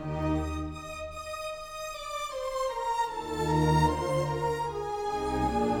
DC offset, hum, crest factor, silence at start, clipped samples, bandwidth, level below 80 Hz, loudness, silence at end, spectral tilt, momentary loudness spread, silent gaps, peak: under 0.1%; none; 18 dB; 0 s; under 0.1%; 17.5 kHz; -42 dBFS; -31 LUFS; 0 s; -6 dB/octave; 12 LU; none; -12 dBFS